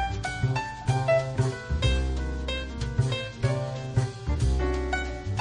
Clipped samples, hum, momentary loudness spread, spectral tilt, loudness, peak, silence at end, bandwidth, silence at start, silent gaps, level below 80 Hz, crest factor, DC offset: under 0.1%; none; 6 LU; -6 dB/octave; -28 LUFS; -12 dBFS; 0 s; 10.5 kHz; 0 s; none; -32 dBFS; 16 dB; under 0.1%